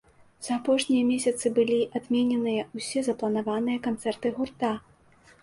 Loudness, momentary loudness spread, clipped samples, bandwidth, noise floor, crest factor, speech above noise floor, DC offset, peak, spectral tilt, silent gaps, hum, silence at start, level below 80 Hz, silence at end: -27 LUFS; 7 LU; under 0.1%; 11.5 kHz; -57 dBFS; 16 dB; 31 dB; under 0.1%; -12 dBFS; -4.5 dB/octave; none; none; 0.4 s; -66 dBFS; 0.65 s